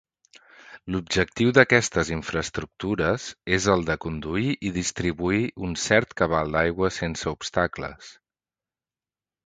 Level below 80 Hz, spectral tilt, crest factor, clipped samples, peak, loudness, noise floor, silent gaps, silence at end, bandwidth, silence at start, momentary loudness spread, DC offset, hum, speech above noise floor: -44 dBFS; -4.5 dB/octave; 24 dB; under 0.1%; 0 dBFS; -24 LUFS; under -90 dBFS; none; 1.35 s; 9.6 kHz; 0.65 s; 11 LU; under 0.1%; none; over 66 dB